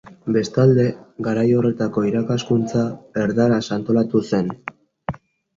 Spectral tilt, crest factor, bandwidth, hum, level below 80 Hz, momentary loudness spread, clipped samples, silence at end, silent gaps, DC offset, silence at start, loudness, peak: -7.5 dB/octave; 16 dB; 7.6 kHz; none; -54 dBFS; 16 LU; under 0.1%; 0.45 s; none; under 0.1%; 0.1 s; -20 LUFS; -4 dBFS